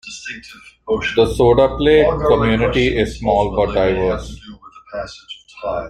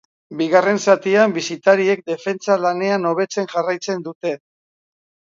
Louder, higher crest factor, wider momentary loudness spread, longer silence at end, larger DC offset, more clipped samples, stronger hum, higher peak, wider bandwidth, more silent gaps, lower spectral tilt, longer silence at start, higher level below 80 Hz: about the same, -16 LUFS vs -18 LUFS; about the same, 16 dB vs 18 dB; first, 20 LU vs 11 LU; second, 0 s vs 1.05 s; neither; neither; neither; about the same, -2 dBFS vs 0 dBFS; first, 11.5 kHz vs 7.8 kHz; second, none vs 4.15-4.21 s; first, -6 dB/octave vs -4.5 dB/octave; second, 0.05 s vs 0.3 s; first, -32 dBFS vs -72 dBFS